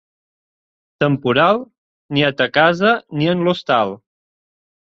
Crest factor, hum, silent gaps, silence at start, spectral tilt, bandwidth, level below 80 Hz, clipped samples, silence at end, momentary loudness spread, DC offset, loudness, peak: 18 dB; none; 1.78-2.09 s; 1 s; -7 dB/octave; 7.6 kHz; -58 dBFS; under 0.1%; 0.9 s; 8 LU; under 0.1%; -17 LUFS; 0 dBFS